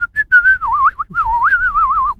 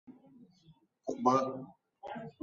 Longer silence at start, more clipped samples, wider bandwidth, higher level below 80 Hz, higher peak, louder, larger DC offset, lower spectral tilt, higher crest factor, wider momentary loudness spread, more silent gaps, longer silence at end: about the same, 0 s vs 0.1 s; neither; second, 6.2 kHz vs 7.6 kHz; first, -36 dBFS vs -78 dBFS; first, -2 dBFS vs -12 dBFS; first, -12 LUFS vs -33 LUFS; neither; second, -4 dB/octave vs -6 dB/octave; second, 12 dB vs 24 dB; second, 6 LU vs 21 LU; neither; about the same, 0.05 s vs 0.1 s